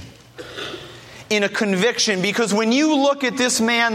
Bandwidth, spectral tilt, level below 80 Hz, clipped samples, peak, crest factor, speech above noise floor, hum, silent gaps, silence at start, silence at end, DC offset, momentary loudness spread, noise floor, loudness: 16 kHz; -3 dB/octave; -60 dBFS; under 0.1%; -6 dBFS; 14 dB; 21 dB; none; none; 0 s; 0 s; under 0.1%; 18 LU; -39 dBFS; -18 LUFS